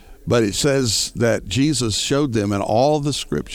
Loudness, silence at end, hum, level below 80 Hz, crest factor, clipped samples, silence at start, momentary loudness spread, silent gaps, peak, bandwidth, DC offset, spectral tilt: -19 LUFS; 0 s; none; -42 dBFS; 14 dB; under 0.1%; 0.1 s; 4 LU; none; -6 dBFS; 18.5 kHz; under 0.1%; -4.5 dB/octave